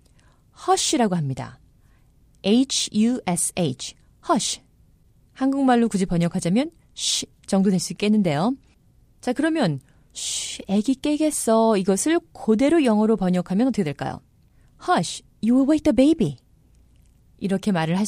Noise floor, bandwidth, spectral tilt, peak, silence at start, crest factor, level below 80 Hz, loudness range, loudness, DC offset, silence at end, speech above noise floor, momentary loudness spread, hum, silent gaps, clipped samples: -56 dBFS; 15.5 kHz; -5 dB/octave; -6 dBFS; 0.6 s; 16 dB; -52 dBFS; 3 LU; -22 LUFS; under 0.1%; 0 s; 36 dB; 13 LU; none; none; under 0.1%